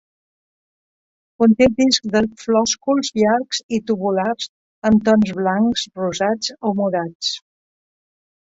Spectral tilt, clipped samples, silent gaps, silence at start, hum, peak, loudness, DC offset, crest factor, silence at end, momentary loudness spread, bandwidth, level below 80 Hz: -4.5 dB/octave; under 0.1%; 3.63-3.69 s, 4.49-4.82 s, 7.15-7.20 s; 1.4 s; none; -2 dBFS; -18 LUFS; under 0.1%; 18 dB; 1.05 s; 9 LU; 8 kHz; -50 dBFS